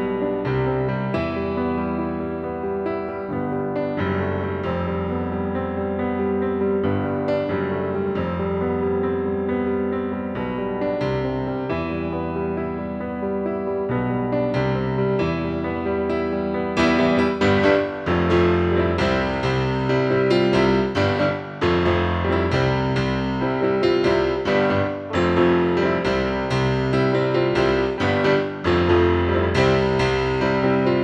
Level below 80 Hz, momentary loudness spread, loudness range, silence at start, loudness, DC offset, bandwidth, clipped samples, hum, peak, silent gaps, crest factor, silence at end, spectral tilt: -42 dBFS; 7 LU; 6 LU; 0 s; -21 LUFS; under 0.1%; 8.6 kHz; under 0.1%; none; -4 dBFS; none; 16 dB; 0 s; -7.5 dB/octave